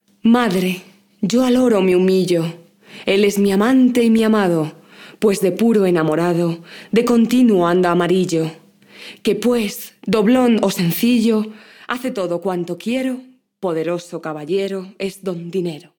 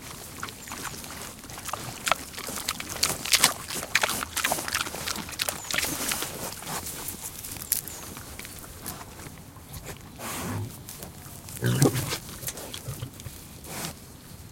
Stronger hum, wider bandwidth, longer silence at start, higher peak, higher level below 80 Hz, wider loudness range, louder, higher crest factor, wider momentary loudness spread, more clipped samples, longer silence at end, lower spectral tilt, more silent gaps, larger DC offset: neither; first, 19.5 kHz vs 17 kHz; first, 0.25 s vs 0 s; about the same, -2 dBFS vs 0 dBFS; second, -58 dBFS vs -52 dBFS; about the same, 7 LU vs 9 LU; first, -17 LUFS vs -29 LUFS; second, 16 dB vs 32 dB; second, 13 LU vs 17 LU; neither; first, 0.2 s vs 0 s; first, -6 dB/octave vs -2.5 dB/octave; neither; neither